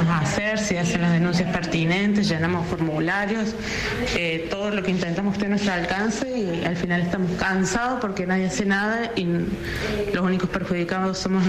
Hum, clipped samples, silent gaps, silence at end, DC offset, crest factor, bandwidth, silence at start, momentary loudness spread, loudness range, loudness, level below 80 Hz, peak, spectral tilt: none; under 0.1%; none; 0 s; under 0.1%; 12 dB; 13.5 kHz; 0 s; 5 LU; 2 LU; -23 LUFS; -42 dBFS; -12 dBFS; -5.5 dB/octave